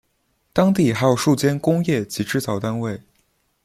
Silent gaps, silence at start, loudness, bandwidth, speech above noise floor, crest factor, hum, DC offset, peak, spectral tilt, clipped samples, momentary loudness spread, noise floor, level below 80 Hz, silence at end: none; 0.55 s; -20 LUFS; 15.5 kHz; 48 dB; 18 dB; none; under 0.1%; -2 dBFS; -6 dB/octave; under 0.1%; 9 LU; -67 dBFS; -54 dBFS; 0.65 s